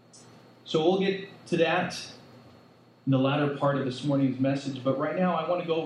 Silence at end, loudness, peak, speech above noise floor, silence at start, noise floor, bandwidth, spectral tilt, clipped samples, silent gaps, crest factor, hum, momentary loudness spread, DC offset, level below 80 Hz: 0 s; -27 LUFS; -12 dBFS; 30 dB; 0.15 s; -56 dBFS; 11.5 kHz; -6.5 dB/octave; under 0.1%; none; 16 dB; none; 8 LU; under 0.1%; -76 dBFS